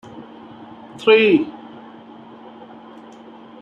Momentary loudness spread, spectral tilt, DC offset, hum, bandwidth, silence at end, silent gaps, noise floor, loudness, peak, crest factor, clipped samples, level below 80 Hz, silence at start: 28 LU; -6 dB/octave; under 0.1%; none; 7.4 kHz; 2.05 s; none; -41 dBFS; -16 LUFS; -2 dBFS; 20 dB; under 0.1%; -68 dBFS; 0.15 s